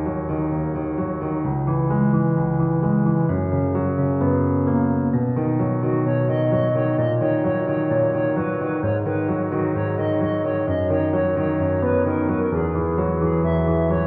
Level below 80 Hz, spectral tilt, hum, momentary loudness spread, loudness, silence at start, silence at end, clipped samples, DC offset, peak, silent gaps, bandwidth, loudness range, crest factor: -40 dBFS; -9.5 dB/octave; none; 4 LU; -21 LUFS; 0 s; 0 s; under 0.1%; under 0.1%; -8 dBFS; none; 3.7 kHz; 2 LU; 12 dB